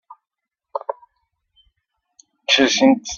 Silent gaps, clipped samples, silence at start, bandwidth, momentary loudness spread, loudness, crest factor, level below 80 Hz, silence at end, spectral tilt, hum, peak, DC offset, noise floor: none; under 0.1%; 0.1 s; 7.2 kHz; 18 LU; -17 LUFS; 20 dB; -60 dBFS; 0 s; -2 dB/octave; none; -2 dBFS; under 0.1%; -83 dBFS